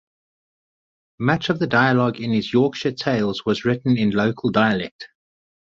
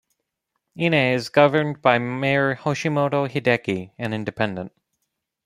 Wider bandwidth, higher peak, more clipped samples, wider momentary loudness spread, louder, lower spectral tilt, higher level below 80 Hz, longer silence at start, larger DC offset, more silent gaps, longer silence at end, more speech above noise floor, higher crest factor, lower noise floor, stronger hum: second, 7.6 kHz vs 12.5 kHz; about the same, -2 dBFS vs -2 dBFS; neither; second, 7 LU vs 10 LU; about the same, -20 LUFS vs -21 LUFS; about the same, -7 dB/octave vs -6 dB/octave; first, -56 dBFS vs -62 dBFS; first, 1.2 s vs 0.75 s; neither; first, 4.91-4.99 s vs none; second, 0.6 s vs 0.75 s; first, over 70 dB vs 57 dB; about the same, 20 dB vs 20 dB; first, under -90 dBFS vs -78 dBFS; neither